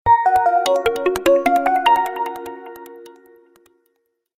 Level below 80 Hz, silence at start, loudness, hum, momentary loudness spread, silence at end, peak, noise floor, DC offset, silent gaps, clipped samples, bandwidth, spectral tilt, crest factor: -50 dBFS; 0.05 s; -17 LUFS; none; 20 LU; 1.3 s; -4 dBFS; -69 dBFS; under 0.1%; none; under 0.1%; 16 kHz; -4 dB/octave; 16 dB